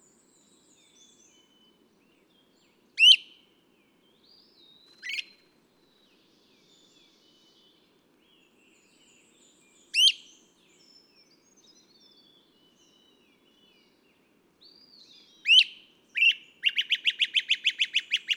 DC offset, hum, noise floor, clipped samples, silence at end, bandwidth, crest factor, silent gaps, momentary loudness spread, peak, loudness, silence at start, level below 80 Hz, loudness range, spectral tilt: under 0.1%; none; -66 dBFS; under 0.1%; 0 s; 18 kHz; 24 dB; none; 18 LU; -6 dBFS; -22 LUFS; 2.95 s; -88 dBFS; 19 LU; 3.5 dB/octave